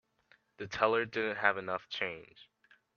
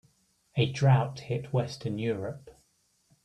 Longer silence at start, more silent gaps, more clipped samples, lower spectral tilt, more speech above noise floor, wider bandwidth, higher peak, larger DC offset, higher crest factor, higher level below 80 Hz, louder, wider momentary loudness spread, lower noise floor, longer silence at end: about the same, 0.6 s vs 0.55 s; neither; neither; second, -4.5 dB/octave vs -7 dB/octave; second, 35 dB vs 42 dB; second, 7 kHz vs 9.4 kHz; about the same, -10 dBFS vs -12 dBFS; neither; first, 26 dB vs 18 dB; second, -72 dBFS vs -62 dBFS; second, -33 LUFS vs -29 LUFS; about the same, 13 LU vs 12 LU; about the same, -69 dBFS vs -70 dBFS; second, 0.55 s vs 0.75 s